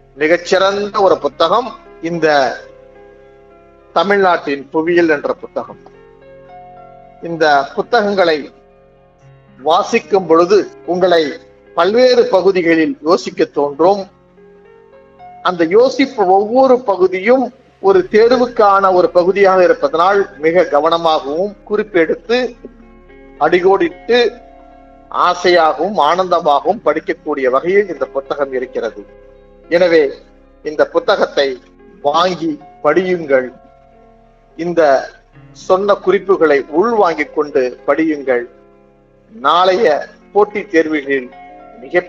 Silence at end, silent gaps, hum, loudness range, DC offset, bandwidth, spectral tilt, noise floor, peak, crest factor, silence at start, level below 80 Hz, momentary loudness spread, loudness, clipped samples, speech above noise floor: 0 s; none; none; 6 LU; under 0.1%; 7.6 kHz; -5 dB/octave; -48 dBFS; 0 dBFS; 14 dB; 0.15 s; -50 dBFS; 10 LU; -13 LUFS; under 0.1%; 35 dB